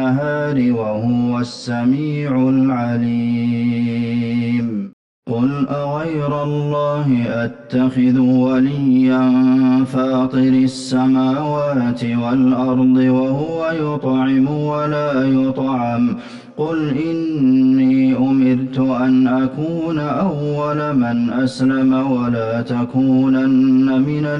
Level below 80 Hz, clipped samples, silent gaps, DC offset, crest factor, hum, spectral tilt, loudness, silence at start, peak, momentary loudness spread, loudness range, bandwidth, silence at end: -52 dBFS; under 0.1%; 4.93-5.23 s; under 0.1%; 8 dB; none; -8 dB/octave; -16 LUFS; 0 s; -6 dBFS; 7 LU; 4 LU; 8.8 kHz; 0 s